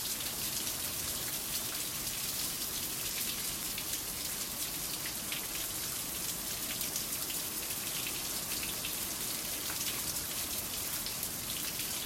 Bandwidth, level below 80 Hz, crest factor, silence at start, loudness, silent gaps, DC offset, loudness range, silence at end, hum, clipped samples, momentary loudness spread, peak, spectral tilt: 16.5 kHz; -58 dBFS; 18 dB; 0 s; -34 LUFS; none; under 0.1%; 1 LU; 0 s; none; under 0.1%; 2 LU; -18 dBFS; -0.5 dB/octave